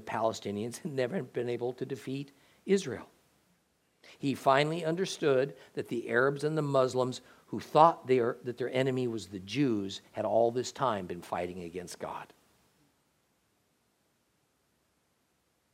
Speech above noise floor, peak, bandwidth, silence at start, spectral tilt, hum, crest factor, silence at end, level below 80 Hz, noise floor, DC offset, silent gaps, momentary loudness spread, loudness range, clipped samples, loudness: 44 dB; -8 dBFS; 15.5 kHz; 0 s; -5.5 dB/octave; none; 24 dB; 3.5 s; -78 dBFS; -75 dBFS; under 0.1%; none; 14 LU; 10 LU; under 0.1%; -31 LUFS